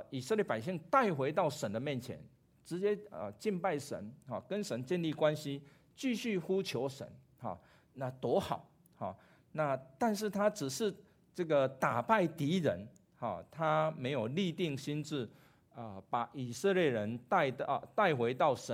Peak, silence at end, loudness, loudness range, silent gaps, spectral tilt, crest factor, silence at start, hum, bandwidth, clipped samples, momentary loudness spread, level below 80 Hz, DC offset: -14 dBFS; 0 s; -35 LUFS; 5 LU; none; -5.5 dB/octave; 22 dB; 0 s; none; 16 kHz; under 0.1%; 14 LU; -74 dBFS; under 0.1%